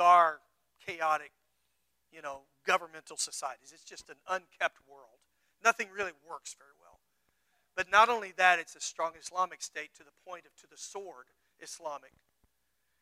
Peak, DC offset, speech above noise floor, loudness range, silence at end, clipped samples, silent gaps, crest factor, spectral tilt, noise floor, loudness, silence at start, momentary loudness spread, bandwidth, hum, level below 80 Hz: -10 dBFS; under 0.1%; 46 dB; 10 LU; 1.05 s; under 0.1%; none; 24 dB; -0.5 dB/octave; -80 dBFS; -31 LUFS; 0 s; 23 LU; 15.5 kHz; none; -76 dBFS